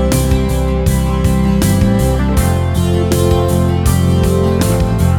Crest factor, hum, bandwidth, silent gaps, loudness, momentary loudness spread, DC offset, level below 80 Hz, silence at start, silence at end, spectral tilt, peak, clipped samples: 12 dB; none; over 20 kHz; none; -13 LUFS; 2 LU; under 0.1%; -20 dBFS; 0 s; 0 s; -6.5 dB/octave; 0 dBFS; under 0.1%